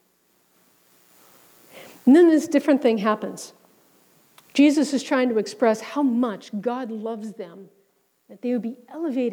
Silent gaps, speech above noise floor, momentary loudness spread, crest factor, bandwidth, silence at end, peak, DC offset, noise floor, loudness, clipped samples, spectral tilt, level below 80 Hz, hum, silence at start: none; 44 dB; 17 LU; 16 dB; 19.5 kHz; 0 s; -6 dBFS; under 0.1%; -65 dBFS; -21 LUFS; under 0.1%; -5 dB/octave; -76 dBFS; none; 1.75 s